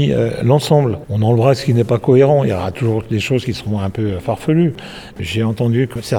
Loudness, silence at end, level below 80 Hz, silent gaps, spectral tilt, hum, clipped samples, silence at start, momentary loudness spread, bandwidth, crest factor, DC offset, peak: -16 LUFS; 0 s; -44 dBFS; none; -7.5 dB/octave; none; under 0.1%; 0 s; 8 LU; 16 kHz; 14 dB; under 0.1%; 0 dBFS